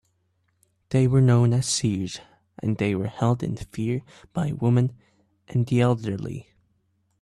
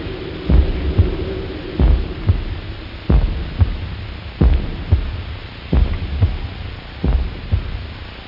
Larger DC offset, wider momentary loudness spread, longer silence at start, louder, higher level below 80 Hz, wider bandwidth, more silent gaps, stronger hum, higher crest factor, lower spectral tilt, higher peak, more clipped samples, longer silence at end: second, under 0.1% vs 0.2%; about the same, 13 LU vs 12 LU; first, 0.9 s vs 0 s; second, -24 LUFS vs -21 LUFS; second, -54 dBFS vs -20 dBFS; first, 11.5 kHz vs 5.6 kHz; neither; neither; about the same, 14 dB vs 16 dB; second, -6.5 dB/octave vs -9.5 dB/octave; second, -10 dBFS vs -2 dBFS; neither; first, 0.8 s vs 0 s